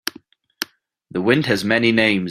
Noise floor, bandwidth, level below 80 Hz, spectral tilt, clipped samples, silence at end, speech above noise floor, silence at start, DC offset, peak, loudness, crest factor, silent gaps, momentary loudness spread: -48 dBFS; 15.5 kHz; -56 dBFS; -5 dB/octave; under 0.1%; 0 s; 31 dB; 0.05 s; under 0.1%; -2 dBFS; -17 LUFS; 18 dB; none; 14 LU